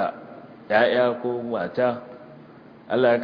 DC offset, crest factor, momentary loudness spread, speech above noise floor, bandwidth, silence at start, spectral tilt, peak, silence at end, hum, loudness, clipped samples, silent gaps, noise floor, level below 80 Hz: under 0.1%; 20 dB; 23 LU; 25 dB; 5.2 kHz; 0 s; -8 dB/octave; -4 dBFS; 0 s; none; -23 LUFS; under 0.1%; none; -46 dBFS; -68 dBFS